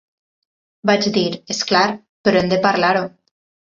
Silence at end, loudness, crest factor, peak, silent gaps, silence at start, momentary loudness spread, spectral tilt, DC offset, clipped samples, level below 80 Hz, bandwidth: 0.6 s; -17 LUFS; 18 dB; -2 dBFS; 2.09-2.24 s; 0.85 s; 7 LU; -4.5 dB/octave; under 0.1%; under 0.1%; -56 dBFS; 7.8 kHz